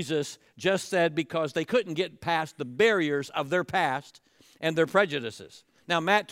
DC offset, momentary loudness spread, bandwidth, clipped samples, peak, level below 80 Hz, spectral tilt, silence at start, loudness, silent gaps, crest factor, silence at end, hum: under 0.1%; 9 LU; 16 kHz; under 0.1%; -8 dBFS; -72 dBFS; -4.5 dB/octave; 0 s; -27 LUFS; none; 18 dB; 0 s; none